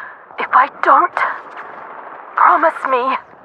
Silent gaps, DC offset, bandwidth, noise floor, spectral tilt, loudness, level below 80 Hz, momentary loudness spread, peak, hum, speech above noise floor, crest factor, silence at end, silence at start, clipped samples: none; under 0.1%; 9.2 kHz; -33 dBFS; -4 dB/octave; -14 LUFS; -72 dBFS; 20 LU; 0 dBFS; none; 19 dB; 16 dB; 0.25 s; 0 s; under 0.1%